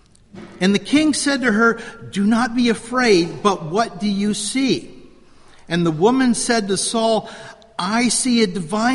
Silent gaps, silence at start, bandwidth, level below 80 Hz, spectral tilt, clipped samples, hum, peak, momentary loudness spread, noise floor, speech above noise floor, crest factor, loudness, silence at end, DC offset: none; 0.35 s; 11.5 kHz; -50 dBFS; -4 dB/octave; under 0.1%; none; -2 dBFS; 7 LU; -45 dBFS; 28 dB; 18 dB; -18 LUFS; 0 s; under 0.1%